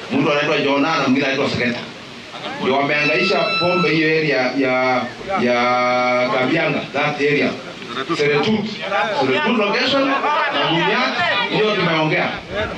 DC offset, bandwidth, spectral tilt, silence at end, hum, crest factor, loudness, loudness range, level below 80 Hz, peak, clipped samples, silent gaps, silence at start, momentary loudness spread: under 0.1%; 9.8 kHz; -5 dB/octave; 0 s; none; 10 dB; -17 LUFS; 2 LU; -54 dBFS; -8 dBFS; under 0.1%; none; 0 s; 7 LU